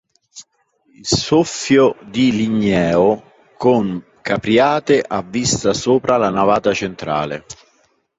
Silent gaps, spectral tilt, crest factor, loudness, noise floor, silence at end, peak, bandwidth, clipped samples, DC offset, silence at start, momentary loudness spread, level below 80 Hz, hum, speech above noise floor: none; -4.5 dB/octave; 16 dB; -16 LUFS; -61 dBFS; 0.65 s; -2 dBFS; 8.2 kHz; under 0.1%; under 0.1%; 0.35 s; 8 LU; -46 dBFS; none; 45 dB